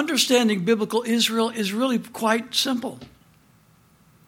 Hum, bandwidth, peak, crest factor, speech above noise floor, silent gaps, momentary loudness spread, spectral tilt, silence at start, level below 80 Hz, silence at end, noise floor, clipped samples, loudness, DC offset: none; 17 kHz; -4 dBFS; 20 dB; 35 dB; none; 6 LU; -3 dB/octave; 0 s; -68 dBFS; 1.2 s; -57 dBFS; under 0.1%; -22 LUFS; under 0.1%